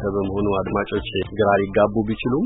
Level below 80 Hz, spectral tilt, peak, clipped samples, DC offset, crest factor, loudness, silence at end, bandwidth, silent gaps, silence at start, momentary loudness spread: -40 dBFS; -11.5 dB/octave; -4 dBFS; under 0.1%; under 0.1%; 16 dB; -21 LUFS; 0 s; 4 kHz; none; 0 s; 6 LU